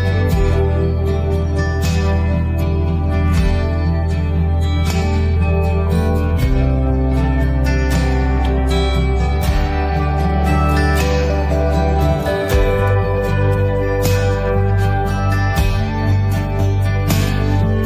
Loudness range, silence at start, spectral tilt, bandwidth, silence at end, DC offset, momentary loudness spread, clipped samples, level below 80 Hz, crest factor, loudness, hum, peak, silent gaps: 1 LU; 0 s; -7 dB/octave; 15.5 kHz; 0 s; under 0.1%; 2 LU; under 0.1%; -20 dBFS; 12 dB; -17 LUFS; none; -2 dBFS; none